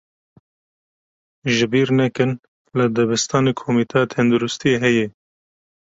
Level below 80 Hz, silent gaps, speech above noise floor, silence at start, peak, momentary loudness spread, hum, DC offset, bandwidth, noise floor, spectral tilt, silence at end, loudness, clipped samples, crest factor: -56 dBFS; 2.48-2.65 s; over 72 dB; 1.45 s; -2 dBFS; 6 LU; none; under 0.1%; 8 kHz; under -90 dBFS; -5 dB/octave; 0.75 s; -19 LUFS; under 0.1%; 18 dB